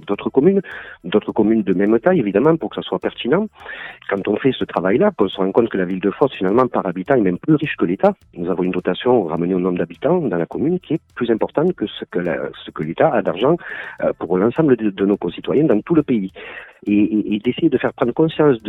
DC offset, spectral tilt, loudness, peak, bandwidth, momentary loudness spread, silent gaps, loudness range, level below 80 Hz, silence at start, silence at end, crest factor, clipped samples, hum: under 0.1%; -9.5 dB/octave; -18 LUFS; -2 dBFS; 4.1 kHz; 9 LU; none; 2 LU; -54 dBFS; 0.05 s; 0 s; 16 dB; under 0.1%; none